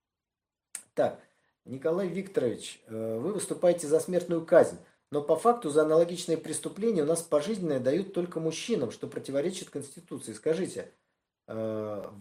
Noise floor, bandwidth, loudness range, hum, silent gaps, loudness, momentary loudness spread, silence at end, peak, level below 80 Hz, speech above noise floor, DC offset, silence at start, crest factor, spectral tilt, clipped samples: under -90 dBFS; 16 kHz; 8 LU; none; none; -29 LUFS; 16 LU; 0 s; -8 dBFS; -76 dBFS; over 61 dB; under 0.1%; 0.75 s; 22 dB; -5 dB/octave; under 0.1%